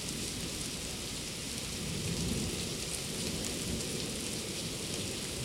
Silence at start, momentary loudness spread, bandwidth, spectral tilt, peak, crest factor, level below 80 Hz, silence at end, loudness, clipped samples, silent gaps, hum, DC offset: 0 s; 3 LU; 16.5 kHz; -3 dB/octave; -16 dBFS; 20 dB; -50 dBFS; 0 s; -36 LUFS; under 0.1%; none; none; under 0.1%